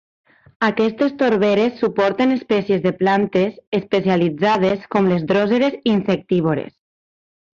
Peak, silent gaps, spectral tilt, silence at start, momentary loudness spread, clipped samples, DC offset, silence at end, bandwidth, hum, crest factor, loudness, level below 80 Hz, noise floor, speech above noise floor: -4 dBFS; 3.67-3.72 s; -7.5 dB/octave; 0.6 s; 4 LU; under 0.1%; under 0.1%; 0.9 s; 7.4 kHz; none; 14 dB; -18 LUFS; -56 dBFS; under -90 dBFS; over 73 dB